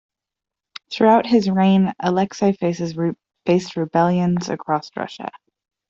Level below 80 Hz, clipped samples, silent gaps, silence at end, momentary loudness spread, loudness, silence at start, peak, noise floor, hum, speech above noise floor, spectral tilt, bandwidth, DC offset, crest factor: -60 dBFS; under 0.1%; none; 0.6 s; 15 LU; -19 LUFS; 0.9 s; -4 dBFS; -86 dBFS; none; 68 dB; -7 dB/octave; 7.4 kHz; under 0.1%; 16 dB